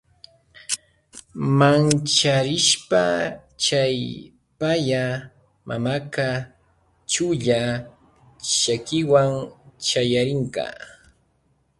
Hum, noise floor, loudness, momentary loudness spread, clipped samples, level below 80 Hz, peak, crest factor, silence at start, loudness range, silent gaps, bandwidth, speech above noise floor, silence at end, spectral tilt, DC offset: none; -65 dBFS; -21 LUFS; 15 LU; under 0.1%; -56 dBFS; -4 dBFS; 20 dB; 0.7 s; 6 LU; none; 11.5 kHz; 44 dB; 0.9 s; -4 dB/octave; under 0.1%